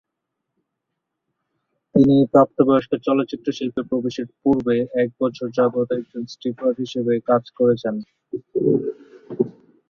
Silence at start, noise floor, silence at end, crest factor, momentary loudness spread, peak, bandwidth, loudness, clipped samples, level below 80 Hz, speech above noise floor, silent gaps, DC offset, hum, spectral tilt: 1.95 s; -80 dBFS; 0.4 s; 18 dB; 12 LU; -2 dBFS; 7 kHz; -20 LUFS; under 0.1%; -58 dBFS; 60 dB; none; under 0.1%; none; -8 dB/octave